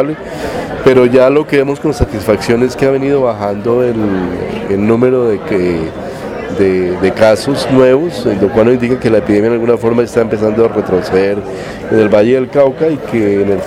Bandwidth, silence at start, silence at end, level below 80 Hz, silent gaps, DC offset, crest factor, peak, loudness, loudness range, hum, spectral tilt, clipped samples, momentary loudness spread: 14.5 kHz; 0 s; 0 s; -36 dBFS; none; under 0.1%; 12 dB; 0 dBFS; -12 LUFS; 3 LU; none; -7 dB/octave; 0.3%; 9 LU